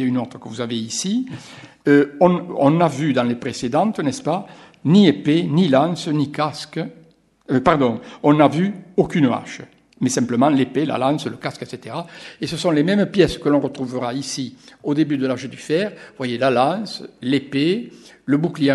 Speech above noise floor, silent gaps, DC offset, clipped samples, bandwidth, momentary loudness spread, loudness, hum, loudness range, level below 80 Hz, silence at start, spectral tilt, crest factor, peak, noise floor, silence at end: 34 dB; none; under 0.1%; under 0.1%; 12 kHz; 14 LU; -19 LUFS; none; 4 LU; -54 dBFS; 0 s; -6 dB/octave; 20 dB; 0 dBFS; -53 dBFS; 0 s